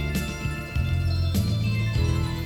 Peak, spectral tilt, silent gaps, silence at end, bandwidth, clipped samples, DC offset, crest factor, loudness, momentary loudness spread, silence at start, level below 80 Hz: -12 dBFS; -6 dB/octave; none; 0 s; 17 kHz; under 0.1%; under 0.1%; 12 dB; -26 LUFS; 5 LU; 0 s; -32 dBFS